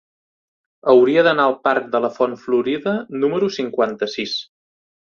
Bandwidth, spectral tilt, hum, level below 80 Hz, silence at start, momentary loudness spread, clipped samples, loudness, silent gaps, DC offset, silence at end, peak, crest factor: 7 kHz; -5.5 dB/octave; none; -64 dBFS; 0.85 s; 10 LU; under 0.1%; -18 LUFS; none; under 0.1%; 0.7 s; 0 dBFS; 18 dB